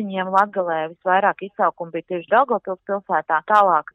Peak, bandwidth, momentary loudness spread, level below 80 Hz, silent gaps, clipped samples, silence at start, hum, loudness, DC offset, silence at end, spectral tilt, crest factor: -4 dBFS; 8.4 kHz; 11 LU; -72 dBFS; none; under 0.1%; 0 s; none; -20 LUFS; under 0.1%; 0.15 s; -6.5 dB/octave; 16 dB